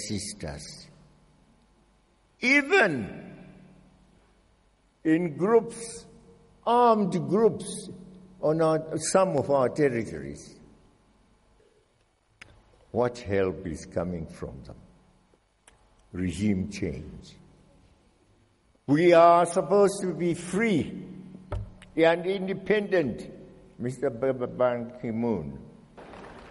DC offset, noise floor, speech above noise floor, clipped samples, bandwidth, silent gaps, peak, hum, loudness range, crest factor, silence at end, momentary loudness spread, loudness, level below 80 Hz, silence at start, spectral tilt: under 0.1%; -67 dBFS; 42 dB; under 0.1%; 11.5 kHz; none; -6 dBFS; none; 11 LU; 22 dB; 0 s; 21 LU; -25 LUFS; -54 dBFS; 0 s; -5.5 dB/octave